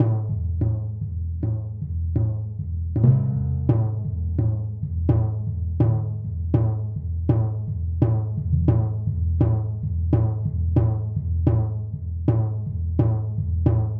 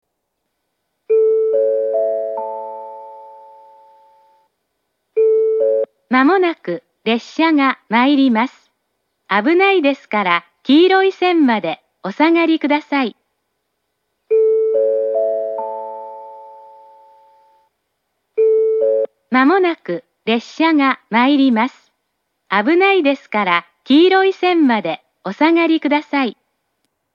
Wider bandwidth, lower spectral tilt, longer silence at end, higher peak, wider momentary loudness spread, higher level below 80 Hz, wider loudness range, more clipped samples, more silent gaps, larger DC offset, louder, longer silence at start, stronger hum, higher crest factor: second, 2.5 kHz vs 7 kHz; first, -13 dB/octave vs -6 dB/octave; second, 0 s vs 0.85 s; second, -6 dBFS vs 0 dBFS; second, 7 LU vs 14 LU; first, -32 dBFS vs -82 dBFS; second, 1 LU vs 7 LU; neither; neither; neither; second, -24 LUFS vs -16 LUFS; second, 0 s vs 1.1 s; neither; about the same, 16 dB vs 16 dB